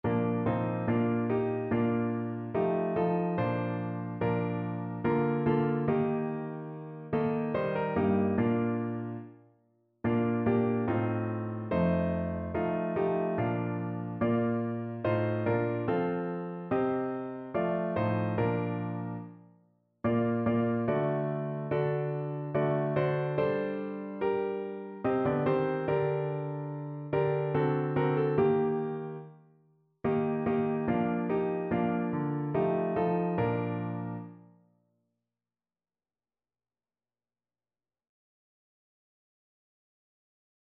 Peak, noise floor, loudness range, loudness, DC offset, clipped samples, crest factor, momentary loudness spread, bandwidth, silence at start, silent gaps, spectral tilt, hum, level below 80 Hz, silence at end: -14 dBFS; under -90 dBFS; 2 LU; -31 LUFS; under 0.1%; under 0.1%; 16 dB; 8 LU; 4.5 kHz; 0.05 s; none; -8 dB/octave; none; -60 dBFS; 6.3 s